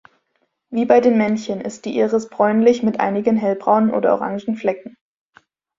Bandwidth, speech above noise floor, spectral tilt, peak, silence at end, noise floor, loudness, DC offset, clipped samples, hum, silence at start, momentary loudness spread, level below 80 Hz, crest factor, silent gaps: 7.6 kHz; 52 dB; -6.5 dB/octave; 0 dBFS; 0.9 s; -69 dBFS; -18 LUFS; under 0.1%; under 0.1%; none; 0.7 s; 10 LU; -62 dBFS; 18 dB; none